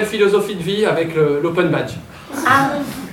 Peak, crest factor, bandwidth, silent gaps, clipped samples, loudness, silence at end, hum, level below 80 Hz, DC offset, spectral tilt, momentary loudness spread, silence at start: -2 dBFS; 16 dB; 17 kHz; none; under 0.1%; -17 LUFS; 0 s; none; -52 dBFS; under 0.1%; -5.5 dB/octave; 11 LU; 0 s